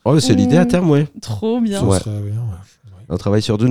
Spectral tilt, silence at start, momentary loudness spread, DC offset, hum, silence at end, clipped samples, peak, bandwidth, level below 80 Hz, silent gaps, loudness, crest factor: -6.5 dB/octave; 0.05 s; 12 LU; under 0.1%; none; 0 s; under 0.1%; 0 dBFS; 15 kHz; -44 dBFS; none; -16 LUFS; 14 dB